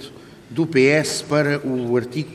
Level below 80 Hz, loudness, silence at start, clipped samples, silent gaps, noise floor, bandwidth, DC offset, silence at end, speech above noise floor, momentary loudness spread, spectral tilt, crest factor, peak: -60 dBFS; -19 LUFS; 0 s; under 0.1%; none; -40 dBFS; 15 kHz; under 0.1%; 0 s; 21 dB; 10 LU; -5 dB/octave; 18 dB; -2 dBFS